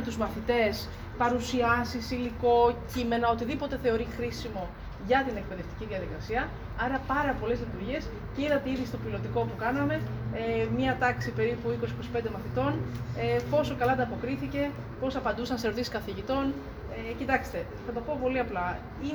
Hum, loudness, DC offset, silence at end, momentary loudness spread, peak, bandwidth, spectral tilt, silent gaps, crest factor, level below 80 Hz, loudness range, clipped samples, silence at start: none; -30 LUFS; under 0.1%; 0 s; 9 LU; -10 dBFS; over 20 kHz; -6.5 dB/octave; none; 20 dB; -44 dBFS; 4 LU; under 0.1%; 0 s